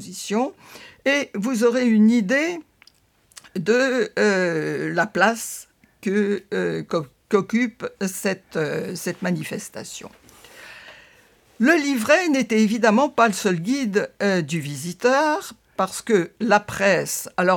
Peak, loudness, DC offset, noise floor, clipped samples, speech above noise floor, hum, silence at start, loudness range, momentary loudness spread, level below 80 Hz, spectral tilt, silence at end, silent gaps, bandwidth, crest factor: -2 dBFS; -21 LUFS; under 0.1%; -57 dBFS; under 0.1%; 36 dB; none; 0 s; 6 LU; 13 LU; -64 dBFS; -4.5 dB/octave; 0 s; none; 18.5 kHz; 20 dB